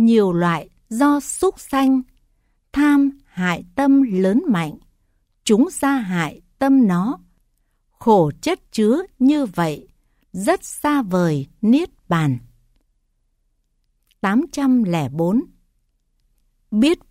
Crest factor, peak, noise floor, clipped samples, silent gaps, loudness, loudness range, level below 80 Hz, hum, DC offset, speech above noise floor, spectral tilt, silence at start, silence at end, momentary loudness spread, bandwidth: 16 dB; -4 dBFS; -66 dBFS; under 0.1%; none; -19 LUFS; 4 LU; -52 dBFS; none; under 0.1%; 49 dB; -6 dB/octave; 0 s; 0.15 s; 9 LU; 15.5 kHz